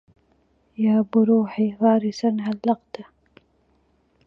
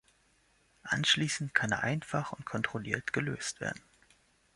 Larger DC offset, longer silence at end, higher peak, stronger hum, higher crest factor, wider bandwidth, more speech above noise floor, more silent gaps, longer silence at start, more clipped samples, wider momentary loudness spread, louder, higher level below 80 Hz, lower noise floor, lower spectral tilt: neither; first, 1.25 s vs 0.75 s; first, -6 dBFS vs -10 dBFS; neither; second, 18 dB vs 24 dB; second, 6.4 kHz vs 11.5 kHz; first, 43 dB vs 36 dB; neither; about the same, 0.8 s vs 0.85 s; neither; first, 16 LU vs 12 LU; first, -21 LUFS vs -32 LUFS; about the same, -66 dBFS vs -64 dBFS; second, -64 dBFS vs -69 dBFS; first, -8 dB/octave vs -3.5 dB/octave